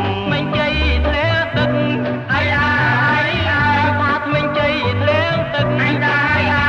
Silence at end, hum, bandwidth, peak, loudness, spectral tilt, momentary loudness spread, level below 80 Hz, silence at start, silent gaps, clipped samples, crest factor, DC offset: 0 s; none; 7.6 kHz; -4 dBFS; -16 LUFS; -7 dB/octave; 4 LU; -30 dBFS; 0 s; none; under 0.1%; 12 dB; under 0.1%